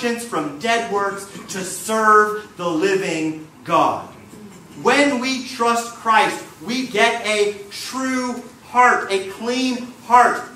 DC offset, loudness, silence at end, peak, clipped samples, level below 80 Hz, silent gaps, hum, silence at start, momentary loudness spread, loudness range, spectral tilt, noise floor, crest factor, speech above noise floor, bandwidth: under 0.1%; -19 LUFS; 0 s; 0 dBFS; under 0.1%; -64 dBFS; none; none; 0 s; 14 LU; 2 LU; -3 dB/octave; -40 dBFS; 18 dB; 21 dB; 16 kHz